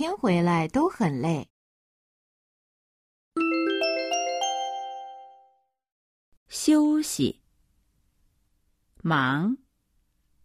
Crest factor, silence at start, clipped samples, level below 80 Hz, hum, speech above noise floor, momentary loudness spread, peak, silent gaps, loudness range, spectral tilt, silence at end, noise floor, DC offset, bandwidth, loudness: 18 dB; 0 s; under 0.1%; -62 dBFS; none; 46 dB; 13 LU; -10 dBFS; 1.50-3.31 s, 5.92-6.46 s; 3 LU; -5 dB/octave; 0.9 s; -70 dBFS; under 0.1%; 15 kHz; -26 LUFS